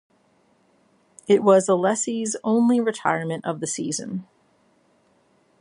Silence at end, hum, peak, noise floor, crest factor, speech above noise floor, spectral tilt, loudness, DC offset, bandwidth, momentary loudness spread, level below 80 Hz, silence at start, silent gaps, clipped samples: 1.4 s; none; -4 dBFS; -62 dBFS; 20 dB; 41 dB; -5 dB/octave; -22 LUFS; under 0.1%; 11.5 kHz; 12 LU; -74 dBFS; 1.3 s; none; under 0.1%